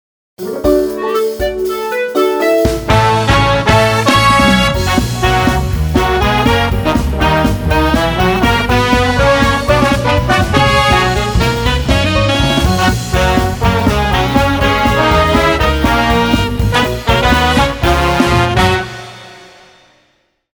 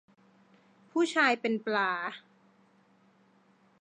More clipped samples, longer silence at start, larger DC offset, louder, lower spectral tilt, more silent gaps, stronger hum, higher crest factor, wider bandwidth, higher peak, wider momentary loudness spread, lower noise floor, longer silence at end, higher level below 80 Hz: neither; second, 0.4 s vs 0.95 s; neither; first, -12 LUFS vs -29 LUFS; first, -5 dB/octave vs -3.5 dB/octave; neither; neither; second, 12 dB vs 22 dB; first, over 20 kHz vs 10 kHz; first, 0 dBFS vs -12 dBFS; second, 5 LU vs 12 LU; second, -58 dBFS vs -65 dBFS; second, 1.1 s vs 1.6 s; first, -22 dBFS vs under -90 dBFS